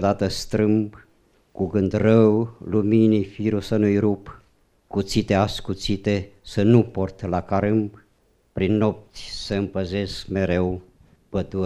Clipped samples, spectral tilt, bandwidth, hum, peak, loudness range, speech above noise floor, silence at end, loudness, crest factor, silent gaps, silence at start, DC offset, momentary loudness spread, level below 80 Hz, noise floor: under 0.1%; -7 dB/octave; 13 kHz; none; -2 dBFS; 5 LU; 41 dB; 0 s; -22 LUFS; 20 dB; none; 0 s; under 0.1%; 12 LU; -46 dBFS; -62 dBFS